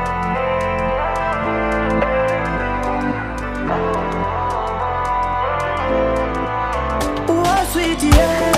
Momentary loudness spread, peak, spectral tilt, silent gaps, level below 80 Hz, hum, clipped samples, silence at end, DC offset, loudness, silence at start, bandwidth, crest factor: 5 LU; 0 dBFS; -5.5 dB/octave; none; -28 dBFS; none; under 0.1%; 0 s; under 0.1%; -19 LUFS; 0 s; 15.5 kHz; 18 dB